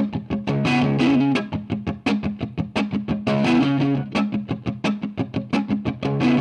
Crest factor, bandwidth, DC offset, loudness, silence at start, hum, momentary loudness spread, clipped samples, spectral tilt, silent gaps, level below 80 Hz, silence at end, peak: 14 dB; 9.8 kHz; under 0.1%; -22 LUFS; 0 s; none; 9 LU; under 0.1%; -7 dB/octave; none; -46 dBFS; 0 s; -8 dBFS